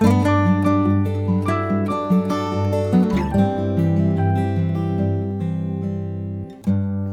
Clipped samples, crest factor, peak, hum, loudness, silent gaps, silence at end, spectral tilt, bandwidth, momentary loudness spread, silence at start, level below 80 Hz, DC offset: under 0.1%; 16 dB; -4 dBFS; none; -20 LUFS; none; 0 s; -8.5 dB/octave; 10.5 kHz; 8 LU; 0 s; -42 dBFS; under 0.1%